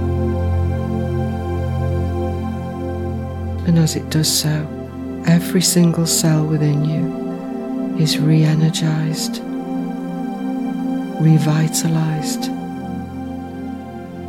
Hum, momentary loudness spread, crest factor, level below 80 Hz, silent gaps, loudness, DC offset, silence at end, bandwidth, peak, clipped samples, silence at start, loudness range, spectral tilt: none; 13 LU; 16 dB; -38 dBFS; none; -19 LUFS; under 0.1%; 0 s; 17.5 kHz; -2 dBFS; under 0.1%; 0 s; 4 LU; -5.5 dB/octave